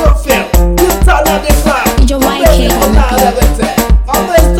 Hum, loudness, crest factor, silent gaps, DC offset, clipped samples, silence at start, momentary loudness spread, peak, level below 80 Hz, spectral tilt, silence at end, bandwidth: none; -9 LUFS; 8 dB; none; under 0.1%; under 0.1%; 0 s; 3 LU; 0 dBFS; -10 dBFS; -5 dB/octave; 0 s; 16.5 kHz